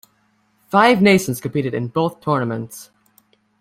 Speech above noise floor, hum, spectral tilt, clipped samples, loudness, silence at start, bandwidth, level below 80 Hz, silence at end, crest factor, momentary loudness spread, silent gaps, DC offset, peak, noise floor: 45 dB; none; -5.5 dB/octave; under 0.1%; -18 LUFS; 0.7 s; 16 kHz; -56 dBFS; 0.75 s; 18 dB; 15 LU; none; under 0.1%; 0 dBFS; -62 dBFS